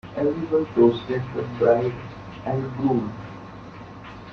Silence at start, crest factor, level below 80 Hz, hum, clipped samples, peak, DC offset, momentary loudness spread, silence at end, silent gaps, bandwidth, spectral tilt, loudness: 0.05 s; 20 dB; -52 dBFS; none; under 0.1%; -4 dBFS; under 0.1%; 21 LU; 0 s; none; 6.4 kHz; -9 dB/octave; -23 LUFS